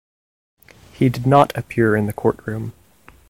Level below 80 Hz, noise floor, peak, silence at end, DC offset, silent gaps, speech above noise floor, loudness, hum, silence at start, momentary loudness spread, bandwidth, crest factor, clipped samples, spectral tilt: -50 dBFS; -50 dBFS; 0 dBFS; 0.6 s; 0.1%; none; 32 dB; -19 LUFS; none; 1 s; 14 LU; 16.5 kHz; 20 dB; under 0.1%; -7.5 dB/octave